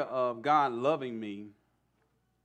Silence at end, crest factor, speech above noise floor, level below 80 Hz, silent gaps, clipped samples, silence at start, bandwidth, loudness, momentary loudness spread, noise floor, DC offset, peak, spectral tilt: 0.95 s; 18 dB; 43 dB; -82 dBFS; none; under 0.1%; 0 s; 8.8 kHz; -30 LUFS; 15 LU; -74 dBFS; under 0.1%; -14 dBFS; -6.5 dB/octave